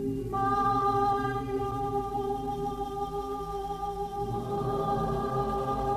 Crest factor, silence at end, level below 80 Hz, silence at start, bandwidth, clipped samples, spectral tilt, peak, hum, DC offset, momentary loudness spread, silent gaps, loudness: 14 dB; 0 s; -44 dBFS; 0 s; 14 kHz; under 0.1%; -7 dB/octave; -16 dBFS; none; under 0.1%; 8 LU; none; -30 LUFS